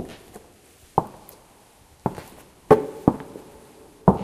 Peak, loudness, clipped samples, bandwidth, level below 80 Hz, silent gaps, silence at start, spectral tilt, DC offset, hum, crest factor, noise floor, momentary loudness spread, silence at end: 0 dBFS; -23 LUFS; under 0.1%; 15.5 kHz; -48 dBFS; none; 0 s; -8 dB/octave; under 0.1%; none; 24 dB; -53 dBFS; 25 LU; 0 s